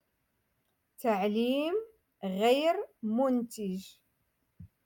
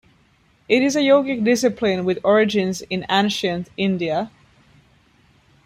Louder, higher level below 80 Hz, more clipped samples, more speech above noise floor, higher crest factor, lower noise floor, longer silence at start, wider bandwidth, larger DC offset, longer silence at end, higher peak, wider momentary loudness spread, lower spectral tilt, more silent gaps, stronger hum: second, -31 LUFS vs -19 LUFS; second, -74 dBFS vs -58 dBFS; neither; first, 48 dB vs 39 dB; about the same, 18 dB vs 18 dB; first, -78 dBFS vs -58 dBFS; first, 1 s vs 0.7 s; first, 17.5 kHz vs 15.5 kHz; neither; second, 0.2 s vs 1.4 s; second, -14 dBFS vs -2 dBFS; first, 11 LU vs 8 LU; about the same, -5.5 dB/octave vs -5 dB/octave; neither; neither